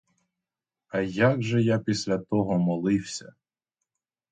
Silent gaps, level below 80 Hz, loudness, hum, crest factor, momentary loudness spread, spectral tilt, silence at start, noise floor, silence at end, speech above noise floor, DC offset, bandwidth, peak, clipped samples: none; -60 dBFS; -26 LUFS; none; 18 dB; 8 LU; -6.5 dB/octave; 0.95 s; -89 dBFS; 1 s; 64 dB; under 0.1%; 9.4 kHz; -10 dBFS; under 0.1%